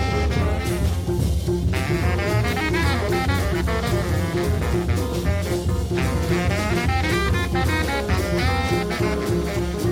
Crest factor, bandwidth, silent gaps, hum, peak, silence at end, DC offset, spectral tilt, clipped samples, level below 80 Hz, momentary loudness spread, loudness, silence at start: 14 dB; 16.5 kHz; none; none; -8 dBFS; 0 s; under 0.1%; -6 dB/octave; under 0.1%; -28 dBFS; 2 LU; -22 LUFS; 0 s